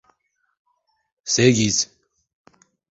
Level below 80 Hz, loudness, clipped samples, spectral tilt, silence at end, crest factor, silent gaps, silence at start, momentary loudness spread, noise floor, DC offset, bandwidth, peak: -56 dBFS; -19 LUFS; under 0.1%; -3.5 dB/octave; 1.05 s; 22 dB; none; 1.25 s; 13 LU; -71 dBFS; under 0.1%; 8 kHz; -2 dBFS